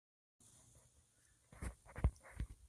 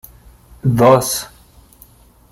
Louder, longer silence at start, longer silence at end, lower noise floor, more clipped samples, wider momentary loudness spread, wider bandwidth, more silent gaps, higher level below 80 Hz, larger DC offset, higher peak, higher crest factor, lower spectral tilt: second, -46 LUFS vs -14 LUFS; first, 1.55 s vs 0.65 s; second, 0 s vs 1.05 s; first, -74 dBFS vs -47 dBFS; neither; first, 24 LU vs 13 LU; second, 13 kHz vs 16.5 kHz; neither; second, -50 dBFS vs -44 dBFS; neither; second, -22 dBFS vs -2 dBFS; first, 24 dB vs 16 dB; about the same, -6.5 dB/octave vs -5.5 dB/octave